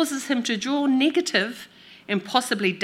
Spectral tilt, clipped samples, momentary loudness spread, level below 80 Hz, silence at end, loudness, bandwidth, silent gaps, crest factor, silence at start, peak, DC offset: -3.5 dB/octave; under 0.1%; 9 LU; -76 dBFS; 0 s; -23 LUFS; 16 kHz; none; 22 dB; 0 s; -2 dBFS; under 0.1%